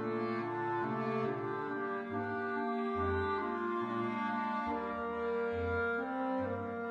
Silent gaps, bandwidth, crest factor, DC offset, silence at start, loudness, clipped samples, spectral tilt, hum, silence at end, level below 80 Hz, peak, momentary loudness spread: none; 7.8 kHz; 14 dB; under 0.1%; 0 s; -36 LUFS; under 0.1%; -8 dB/octave; none; 0 s; -60 dBFS; -22 dBFS; 4 LU